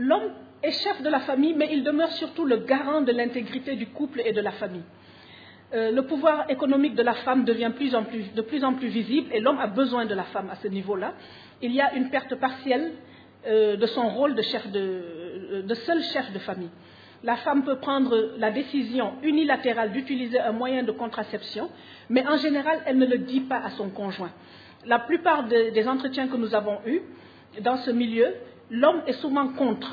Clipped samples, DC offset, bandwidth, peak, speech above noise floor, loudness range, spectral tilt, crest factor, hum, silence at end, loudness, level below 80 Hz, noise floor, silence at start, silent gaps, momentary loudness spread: under 0.1%; under 0.1%; 5 kHz; -6 dBFS; 24 dB; 3 LU; -7 dB/octave; 20 dB; none; 0 s; -25 LUFS; -74 dBFS; -49 dBFS; 0 s; none; 11 LU